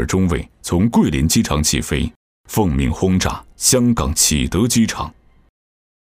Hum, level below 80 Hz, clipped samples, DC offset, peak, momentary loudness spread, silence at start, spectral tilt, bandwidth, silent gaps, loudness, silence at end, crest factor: none; -30 dBFS; under 0.1%; under 0.1%; -2 dBFS; 8 LU; 0 s; -4 dB/octave; 16 kHz; 2.16-2.44 s; -17 LUFS; 1 s; 16 dB